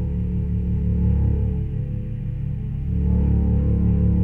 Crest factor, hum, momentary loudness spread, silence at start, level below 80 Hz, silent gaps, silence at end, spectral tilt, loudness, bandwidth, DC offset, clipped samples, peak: 12 dB; none; 8 LU; 0 s; -24 dBFS; none; 0 s; -12.5 dB/octave; -22 LUFS; 3 kHz; under 0.1%; under 0.1%; -8 dBFS